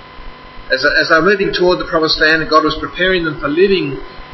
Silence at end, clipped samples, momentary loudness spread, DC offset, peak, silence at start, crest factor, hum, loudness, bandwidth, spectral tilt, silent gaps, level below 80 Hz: 0 s; under 0.1%; 7 LU; 0.1%; 0 dBFS; 0 s; 14 dB; none; -13 LUFS; 6.2 kHz; -5 dB/octave; none; -36 dBFS